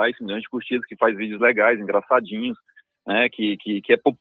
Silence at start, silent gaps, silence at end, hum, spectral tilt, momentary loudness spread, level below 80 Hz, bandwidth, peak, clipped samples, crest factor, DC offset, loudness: 0 s; none; 0.05 s; none; -7.5 dB/octave; 11 LU; -70 dBFS; 4.3 kHz; -2 dBFS; under 0.1%; 20 dB; under 0.1%; -21 LUFS